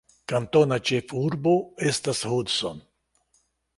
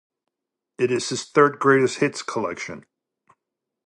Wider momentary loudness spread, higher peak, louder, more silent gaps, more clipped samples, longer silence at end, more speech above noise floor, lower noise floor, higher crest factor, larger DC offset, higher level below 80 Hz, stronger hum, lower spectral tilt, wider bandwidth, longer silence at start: second, 8 LU vs 15 LU; about the same, -6 dBFS vs -4 dBFS; second, -25 LUFS vs -21 LUFS; neither; neither; about the same, 1 s vs 1.05 s; second, 45 dB vs 63 dB; second, -69 dBFS vs -85 dBFS; about the same, 20 dB vs 20 dB; neither; first, -60 dBFS vs -68 dBFS; neither; about the same, -5 dB/octave vs -4.5 dB/octave; about the same, 11.5 kHz vs 11 kHz; second, 0.3 s vs 0.8 s